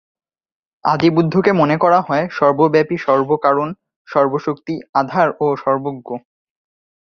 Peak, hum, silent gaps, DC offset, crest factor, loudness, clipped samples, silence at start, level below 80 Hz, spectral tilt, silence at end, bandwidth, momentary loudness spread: 0 dBFS; none; 3.96-4.05 s, 4.89-4.93 s; under 0.1%; 16 dB; -16 LUFS; under 0.1%; 0.85 s; -58 dBFS; -8 dB/octave; 0.9 s; 6.8 kHz; 12 LU